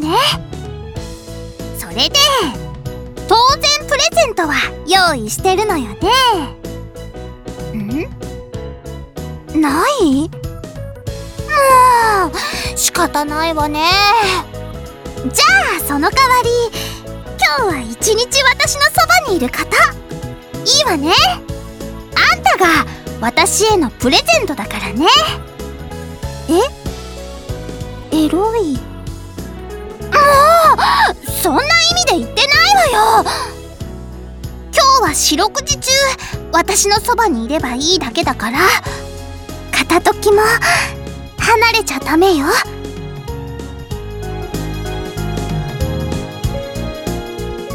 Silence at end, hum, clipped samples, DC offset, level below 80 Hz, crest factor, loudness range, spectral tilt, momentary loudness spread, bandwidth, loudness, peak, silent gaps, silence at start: 0 s; none; under 0.1%; under 0.1%; -32 dBFS; 14 dB; 7 LU; -3 dB/octave; 19 LU; over 20 kHz; -13 LUFS; 0 dBFS; none; 0 s